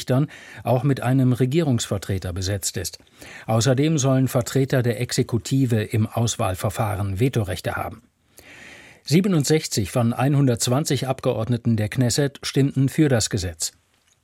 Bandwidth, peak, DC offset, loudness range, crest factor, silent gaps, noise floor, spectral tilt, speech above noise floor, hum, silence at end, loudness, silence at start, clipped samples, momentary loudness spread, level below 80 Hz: 16.5 kHz; -6 dBFS; under 0.1%; 3 LU; 16 dB; none; -48 dBFS; -5.5 dB/octave; 27 dB; none; 0.55 s; -22 LUFS; 0 s; under 0.1%; 9 LU; -50 dBFS